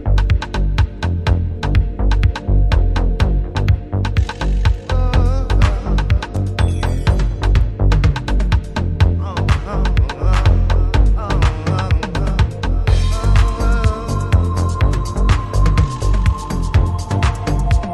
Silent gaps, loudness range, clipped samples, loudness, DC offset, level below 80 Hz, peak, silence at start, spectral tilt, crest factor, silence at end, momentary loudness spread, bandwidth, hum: none; 1 LU; under 0.1%; -17 LUFS; under 0.1%; -16 dBFS; 0 dBFS; 0 s; -6.5 dB/octave; 14 dB; 0 s; 3 LU; 11 kHz; none